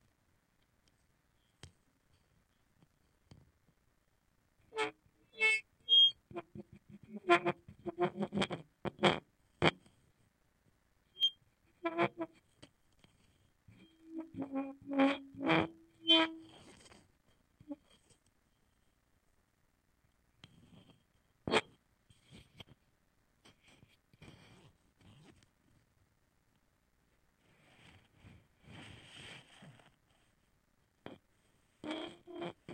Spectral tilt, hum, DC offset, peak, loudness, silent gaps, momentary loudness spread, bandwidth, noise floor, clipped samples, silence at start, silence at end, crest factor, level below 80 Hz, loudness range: -4 dB/octave; none; under 0.1%; -8 dBFS; -33 LUFS; none; 25 LU; 16 kHz; -76 dBFS; under 0.1%; 1.65 s; 0 s; 32 dB; -74 dBFS; 25 LU